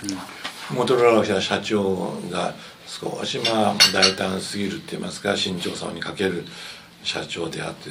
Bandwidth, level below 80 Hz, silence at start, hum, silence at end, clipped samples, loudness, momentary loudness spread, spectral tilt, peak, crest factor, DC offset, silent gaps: 16 kHz; -60 dBFS; 0 s; none; 0 s; under 0.1%; -22 LUFS; 15 LU; -3.5 dB/octave; 0 dBFS; 24 dB; under 0.1%; none